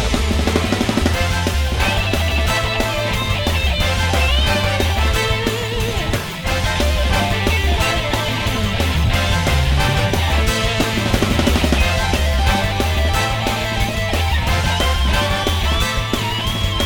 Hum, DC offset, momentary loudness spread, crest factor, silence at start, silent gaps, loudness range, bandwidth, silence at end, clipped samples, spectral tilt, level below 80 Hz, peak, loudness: none; 0.5%; 3 LU; 16 dB; 0 s; none; 1 LU; 19.5 kHz; 0 s; under 0.1%; -4.5 dB/octave; -22 dBFS; 0 dBFS; -17 LUFS